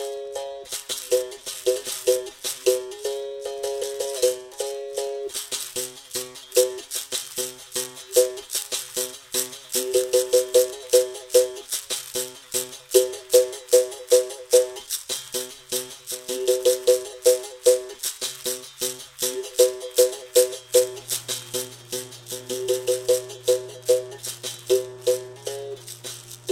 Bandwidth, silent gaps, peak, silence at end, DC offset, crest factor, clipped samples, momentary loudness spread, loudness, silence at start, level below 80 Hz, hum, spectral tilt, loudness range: 17 kHz; none; -2 dBFS; 0 s; under 0.1%; 22 dB; under 0.1%; 11 LU; -24 LUFS; 0 s; -66 dBFS; none; -1.5 dB/octave; 5 LU